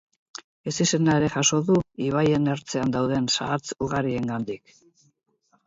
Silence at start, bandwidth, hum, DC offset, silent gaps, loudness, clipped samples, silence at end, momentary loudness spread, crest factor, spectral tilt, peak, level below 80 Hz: 0.65 s; 8 kHz; none; under 0.1%; none; -24 LUFS; under 0.1%; 1.1 s; 14 LU; 18 dB; -4.5 dB/octave; -6 dBFS; -54 dBFS